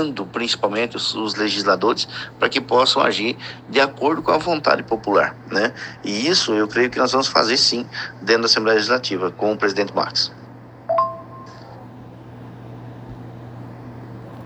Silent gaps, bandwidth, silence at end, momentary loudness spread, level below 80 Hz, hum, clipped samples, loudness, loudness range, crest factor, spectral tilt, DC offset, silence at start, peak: none; 9 kHz; 0 s; 21 LU; -56 dBFS; none; under 0.1%; -19 LUFS; 11 LU; 20 dB; -3.5 dB/octave; under 0.1%; 0 s; 0 dBFS